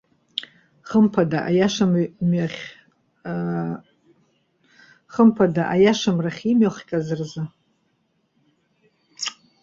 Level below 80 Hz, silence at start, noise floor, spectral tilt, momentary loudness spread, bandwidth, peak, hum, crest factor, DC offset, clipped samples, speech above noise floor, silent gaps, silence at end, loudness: -60 dBFS; 0.35 s; -68 dBFS; -6.5 dB/octave; 14 LU; 7.6 kHz; -4 dBFS; none; 18 dB; under 0.1%; under 0.1%; 49 dB; none; 0.3 s; -21 LUFS